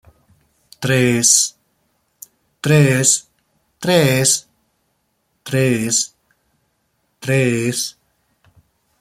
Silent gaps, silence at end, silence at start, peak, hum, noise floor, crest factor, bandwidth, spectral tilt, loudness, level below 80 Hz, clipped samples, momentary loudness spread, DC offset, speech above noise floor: none; 1.1 s; 0.8 s; 0 dBFS; none; -67 dBFS; 20 dB; 16 kHz; -3.5 dB/octave; -16 LUFS; -56 dBFS; under 0.1%; 14 LU; under 0.1%; 52 dB